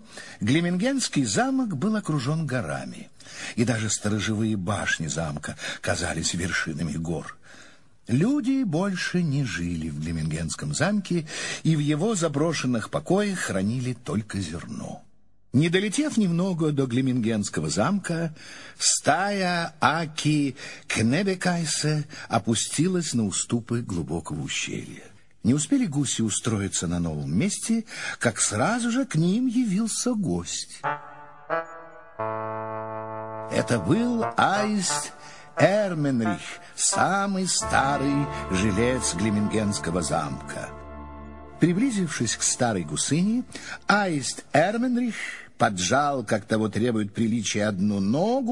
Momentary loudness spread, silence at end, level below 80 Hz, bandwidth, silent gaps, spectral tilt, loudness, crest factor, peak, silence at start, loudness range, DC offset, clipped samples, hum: 11 LU; 0 s; -52 dBFS; 11.5 kHz; none; -4.5 dB/octave; -25 LUFS; 22 dB; -4 dBFS; 0.1 s; 3 LU; 0.3%; under 0.1%; none